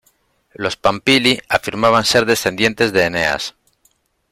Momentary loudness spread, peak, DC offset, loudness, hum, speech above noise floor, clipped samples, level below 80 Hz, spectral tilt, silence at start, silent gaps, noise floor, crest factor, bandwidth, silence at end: 10 LU; -2 dBFS; under 0.1%; -15 LUFS; none; 45 dB; under 0.1%; -48 dBFS; -3.5 dB/octave; 0.6 s; none; -61 dBFS; 16 dB; 16.5 kHz; 0.8 s